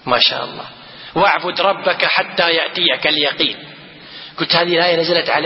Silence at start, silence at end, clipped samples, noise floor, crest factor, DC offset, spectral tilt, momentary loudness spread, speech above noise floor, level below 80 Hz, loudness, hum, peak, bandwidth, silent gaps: 0.05 s; 0 s; under 0.1%; -37 dBFS; 18 dB; under 0.1%; -6.5 dB/octave; 19 LU; 21 dB; -58 dBFS; -15 LUFS; none; 0 dBFS; 5.8 kHz; none